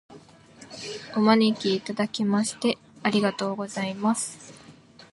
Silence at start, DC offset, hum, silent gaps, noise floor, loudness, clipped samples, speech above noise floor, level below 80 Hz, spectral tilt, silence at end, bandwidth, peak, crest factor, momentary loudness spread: 0.1 s; under 0.1%; none; none; -50 dBFS; -25 LUFS; under 0.1%; 26 dB; -70 dBFS; -4.5 dB/octave; 0.4 s; 11.5 kHz; -6 dBFS; 20 dB; 15 LU